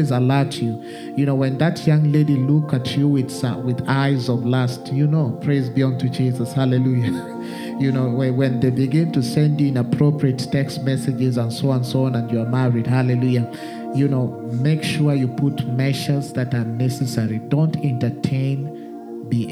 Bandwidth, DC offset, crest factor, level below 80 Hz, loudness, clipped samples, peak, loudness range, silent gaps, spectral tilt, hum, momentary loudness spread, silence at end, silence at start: 13.5 kHz; under 0.1%; 16 dB; -58 dBFS; -20 LUFS; under 0.1%; -4 dBFS; 2 LU; none; -7.5 dB/octave; none; 6 LU; 0 s; 0 s